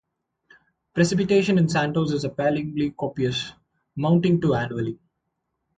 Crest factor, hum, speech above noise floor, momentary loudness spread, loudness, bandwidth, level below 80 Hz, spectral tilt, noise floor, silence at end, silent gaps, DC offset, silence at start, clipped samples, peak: 16 dB; none; 56 dB; 12 LU; -23 LUFS; 9.2 kHz; -54 dBFS; -6.5 dB/octave; -78 dBFS; 0.8 s; none; under 0.1%; 0.95 s; under 0.1%; -6 dBFS